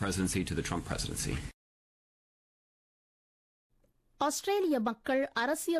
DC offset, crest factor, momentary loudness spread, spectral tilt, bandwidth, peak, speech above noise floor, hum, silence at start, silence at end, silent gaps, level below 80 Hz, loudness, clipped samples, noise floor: under 0.1%; 16 dB; 6 LU; -4.5 dB/octave; 14.5 kHz; -20 dBFS; 38 dB; none; 0 s; 0 s; 1.54-3.70 s; -50 dBFS; -33 LUFS; under 0.1%; -70 dBFS